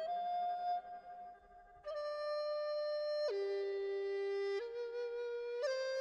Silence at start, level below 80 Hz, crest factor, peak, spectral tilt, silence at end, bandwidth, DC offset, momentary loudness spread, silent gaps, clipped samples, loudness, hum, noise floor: 0 s; -78 dBFS; 12 dB; -28 dBFS; -2.5 dB/octave; 0 s; 9.4 kHz; under 0.1%; 13 LU; none; under 0.1%; -40 LUFS; none; -61 dBFS